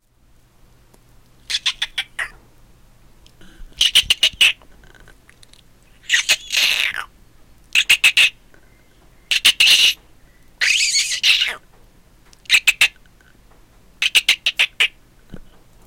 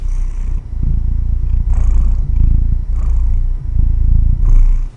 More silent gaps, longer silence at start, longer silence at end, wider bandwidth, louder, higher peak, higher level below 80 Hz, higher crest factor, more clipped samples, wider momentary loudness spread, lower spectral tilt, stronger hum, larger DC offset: neither; first, 1.5 s vs 0 s; first, 0.45 s vs 0.05 s; first, 17 kHz vs 2.3 kHz; first, -15 LUFS vs -18 LUFS; about the same, -2 dBFS vs 0 dBFS; second, -48 dBFS vs -12 dBFS; first, 18 dB vs 10 dB; neither; first, 13 LU vs 7 LU; second, 2.5 dB/octave vs -9 dB/octave; neither; neither